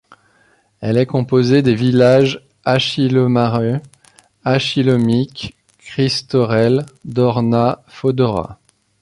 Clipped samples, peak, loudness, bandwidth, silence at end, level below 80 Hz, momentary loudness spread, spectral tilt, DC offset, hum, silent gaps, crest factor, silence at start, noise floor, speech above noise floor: under 0.1%; -2 dBFS; -16 LUFS; 11.5 kHz; 0.45 s; -50 dBFS; 12 LU; -7 dB/octave; under 0.1%; none; none; 14 dB; 0.8 s; -56 dBFS; 41 dB